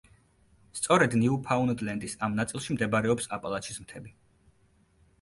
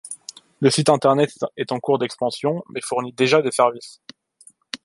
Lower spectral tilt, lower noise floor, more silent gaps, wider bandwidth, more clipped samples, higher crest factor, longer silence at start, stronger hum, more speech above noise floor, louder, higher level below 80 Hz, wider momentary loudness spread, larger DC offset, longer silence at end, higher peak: about the same, -5 dB/octave vs -4.5 dB/octave; first, -65 dBFS vs -53 dBFS; neither; about the same, 11.5 kHz vs 11.5 kHz; neither; about the same, 22 dB vs 18 dB; first, 0.75 s vs 0.05 s; neither; first, 37 dB vs 33 dB; second, -28 LUFS vs -20 LUFS; first, -60 dBFS vs -66 dBFS; about the same, 16 LU vs 18 LU; neither; first, 1.1 s vs 0.1 s; second, -8 dBFS vs -2 dBFS